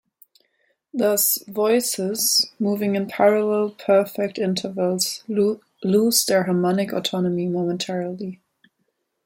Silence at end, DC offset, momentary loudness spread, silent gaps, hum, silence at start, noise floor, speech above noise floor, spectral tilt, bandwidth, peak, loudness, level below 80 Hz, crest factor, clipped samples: 0.9 s; under 0.1%; 8 LU; none; none; 0.95 s; -73 dBFS; 52 dB; -4 dB/octave; 16.5 kHz; -4 dBFS; -21 LUFS; -68 dBFS; 18 dB; under 0.1%